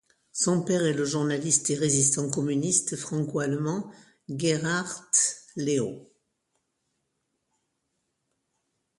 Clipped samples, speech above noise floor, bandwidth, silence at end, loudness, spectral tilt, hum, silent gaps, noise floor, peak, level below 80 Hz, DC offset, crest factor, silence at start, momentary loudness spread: under 0.1%; 52 dB; 11.5 kHz; 2.95 s; -26 LUFS; -4 dB/octave; none; none; -78 dBFS; -8 dBFS; -68 dBFS; under 0.1%; 20 dB; 0.35 s; 10 LU